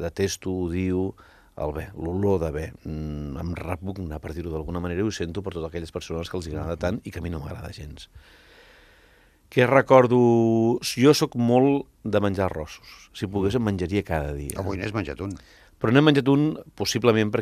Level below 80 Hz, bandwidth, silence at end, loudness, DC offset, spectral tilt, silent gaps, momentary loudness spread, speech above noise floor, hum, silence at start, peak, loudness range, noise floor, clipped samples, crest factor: -46 dBFS; 14.5 kHz; 0 s; -24 LUFS; under 0.1%; -6 dB/octave; none; 15 LU; 33 dB; none; 0 s; -2 dBFS; 12 LU; -57 dBFS; under 0.1%; 22 dB